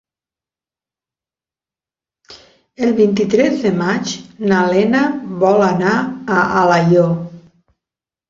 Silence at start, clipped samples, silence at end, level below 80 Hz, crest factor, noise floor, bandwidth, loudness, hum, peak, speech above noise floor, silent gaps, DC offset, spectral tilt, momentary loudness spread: 2.3 s; under 0.1%; 0.9 s; -54 dBFS; 16 dB; under -90 dBFS; 7.6 kHz; -15 LUFS; none; -2 dBFS; over 76 dB; none; under 0.1%; -6.5 dB/octave; 8 LU